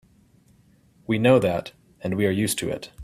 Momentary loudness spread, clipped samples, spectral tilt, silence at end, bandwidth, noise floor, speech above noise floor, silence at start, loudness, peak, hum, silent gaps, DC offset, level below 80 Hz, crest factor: 17 LU; under 0.1%; -5.5 dB/octave; 0 s; 16 kHz; -58 dBFS; 35 dB; 1.1 s; -23 LUFS; -4 dBFS; none; none; under 0.1%; -56 dBFS; 20 dB